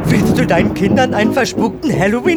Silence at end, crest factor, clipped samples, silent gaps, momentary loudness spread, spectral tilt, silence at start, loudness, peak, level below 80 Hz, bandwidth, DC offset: 0 s; 12 dB; under 0.1%; none; 4 LU; -6 dB/octave; 0 s; -14 LUFS; -2 dBFS; -34 dBFS; over 20 kHz; under 0.1%